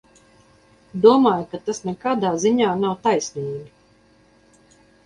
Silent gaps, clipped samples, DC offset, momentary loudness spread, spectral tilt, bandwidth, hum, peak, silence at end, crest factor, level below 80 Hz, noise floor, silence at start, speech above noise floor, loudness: none; under 0.1%; under 0.1%; 15 LU; -5.5 dB/octave; 10.5 kHz; none; -2 dBFS; 1.4 s; 20 dB; -62 dBFS; -56 dBFS; 0.95 s; 36 dB; -20 LUFS